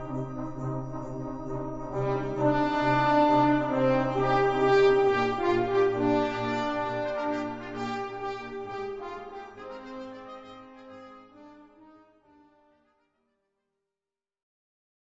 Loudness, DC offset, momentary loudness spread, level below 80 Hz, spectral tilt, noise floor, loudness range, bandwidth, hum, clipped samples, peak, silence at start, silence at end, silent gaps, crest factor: -27 LUFS; under 0.1%; 20 LU; -50 dBFS; -7 dB/octave; under -90 dBFS; 20 LU; 8 kHz; none; under 0.1%; -12 dBFS; 0 s; 3.5 s; none; 18 dB